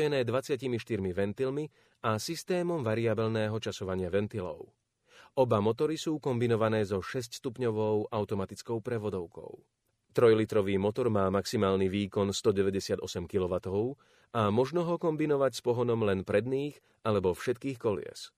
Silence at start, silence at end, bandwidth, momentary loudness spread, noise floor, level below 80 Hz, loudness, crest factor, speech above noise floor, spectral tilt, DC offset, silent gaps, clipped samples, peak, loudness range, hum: 0 s; 0.1 s; 15.5 kHz; 9 LU; -60 dBFS; -64 dBFS; -31 LUFS; 18 dB; 30 dB; -6 dB/octave; under 0.1%; none; under 0.1%; -12 dBFS; 3 LU; none